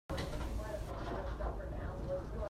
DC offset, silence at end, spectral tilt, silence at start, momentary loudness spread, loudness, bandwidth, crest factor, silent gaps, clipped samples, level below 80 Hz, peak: under 0.1%; 0.05 s; -6.5 dB/octave; 0.1 s; 2 LU; -42 LUFS; 14.5 kHz; 14 dB; none; under 0.1%; -44 dBFS; -26 dBFS